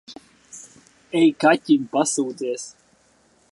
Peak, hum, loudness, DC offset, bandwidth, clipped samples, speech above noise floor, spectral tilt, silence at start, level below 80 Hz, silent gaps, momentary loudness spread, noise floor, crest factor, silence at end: -4 dBFS; none; -20 LUFS; under 0.1%; 11.5 kHz; under 0.1%; 40 dB; -4 dB/octave; 0.1 s; -70 dBFS; none; 24 LU; -59 dBFS; 20 dB; 0.8 s